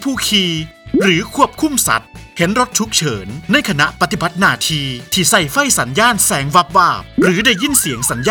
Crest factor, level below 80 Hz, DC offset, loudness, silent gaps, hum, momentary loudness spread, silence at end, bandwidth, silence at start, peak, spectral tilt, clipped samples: 14 dB; -40 dBFS; under 0.1%; -14 LUFS; none; none; 7 LU; 0 s; over 20 kHz; 0 s; 0 dBFS; -3 dB/octave; under 0.1%